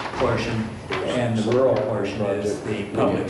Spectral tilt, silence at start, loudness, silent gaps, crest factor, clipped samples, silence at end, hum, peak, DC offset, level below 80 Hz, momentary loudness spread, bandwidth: -6.5 dB/octave; 0 s; -23 LUFS; none; 14 dB; under 0.1%; 0 s; none; -8 dBFS; under 0.1%; -48 dBFS; 8 LU; 11.5 kHz